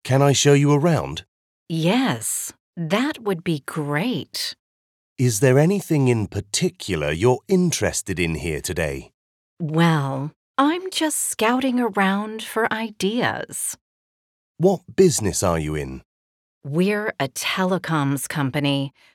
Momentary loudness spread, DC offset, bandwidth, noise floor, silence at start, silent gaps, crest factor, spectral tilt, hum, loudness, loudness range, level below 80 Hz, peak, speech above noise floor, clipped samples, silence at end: 10 LU; under 0.1%; 17 kHz; under -90 dBFS; 0.05 s; 1.28-1.66 s, 2.60-2.73 s, 4.59-5.16 s, 9.14-9.57 s, 10.36-10.54 s, 13.81-14.55 s, 16.05-16.61 s; 18 dB; -5 dB/octave; none; -21 LUFS; 3 LU; -48 dBFS; -4 dBFS; over 69 dB; under 0.1%; 0.25 s